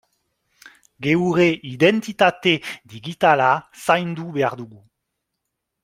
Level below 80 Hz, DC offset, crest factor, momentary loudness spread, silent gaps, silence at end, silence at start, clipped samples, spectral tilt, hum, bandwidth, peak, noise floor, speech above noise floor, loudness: -62 dBFS; under 0.1%; 20 dB; 17 LU; none; 1.2 s; 1 s; under 0.1%; -5.5 dB/octave; none; 15.5 kHz; -2 dBFS; -79 dBFS; 59 dB; -19 LUFS